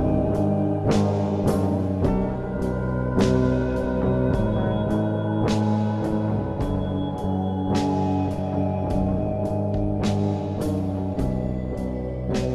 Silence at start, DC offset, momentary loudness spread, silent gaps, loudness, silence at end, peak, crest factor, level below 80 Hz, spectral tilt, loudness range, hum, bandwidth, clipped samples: 0 s; under 0.1%; 5 LU; none; -24 LUFS; 0 s; -6 dBFS; 16 dB; -36 dBFS; -8 dB/octave; 2 LU; none; 12.5 kHz; under 0.1%